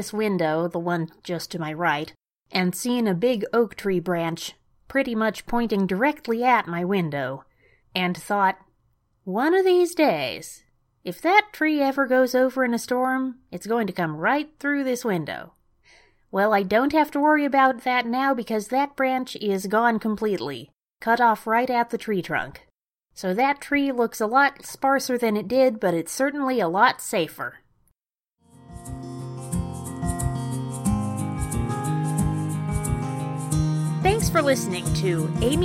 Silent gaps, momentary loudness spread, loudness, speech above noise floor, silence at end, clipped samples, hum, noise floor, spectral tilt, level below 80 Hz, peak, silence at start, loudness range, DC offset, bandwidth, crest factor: none; 11 LU; -23 LUFS; 57 dB; 0 s; under 0.1%; none; -80 dBFS; -5.5 dB/octave; -44 dBFS; -2 dBFS; 0 s; 5 LU; under 0.1%; 16.5 kHz; 22 dB